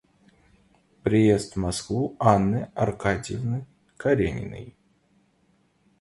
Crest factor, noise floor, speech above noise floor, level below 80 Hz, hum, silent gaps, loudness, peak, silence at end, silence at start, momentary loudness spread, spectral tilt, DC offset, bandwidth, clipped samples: 24 dB; -65 dBFS; 42 dB; -46 dBFS; none; none; -25 LUFS; -2 dBFS; 1.3 s; 1.05 s; 12 LU; -6.5 dB/octave; under 0.1%; 11.5 kHz; under 0.1%